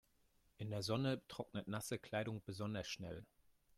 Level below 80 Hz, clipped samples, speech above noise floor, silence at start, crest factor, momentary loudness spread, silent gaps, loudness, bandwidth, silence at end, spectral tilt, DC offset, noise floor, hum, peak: -72 dBFS; under 0.1%; 32 dB; 0.6 s; 20 dB; 9 LU; none; -45 LUFS; 15.5 kHz; 0.55 s; -5 dB/octave; under 0.1%; -76 dBFS; none; -26 dBFS